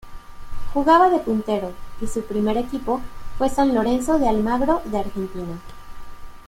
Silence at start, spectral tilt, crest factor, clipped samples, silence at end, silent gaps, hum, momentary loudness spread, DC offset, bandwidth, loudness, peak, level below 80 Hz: 0.05 s; -6 dB/octave; 18 dB; under 0.1%; 0.05 s; none; none; 17 LU; under 0.1%; 16 kHz; -21 LUFS; -4 dBFS; -36 dBFS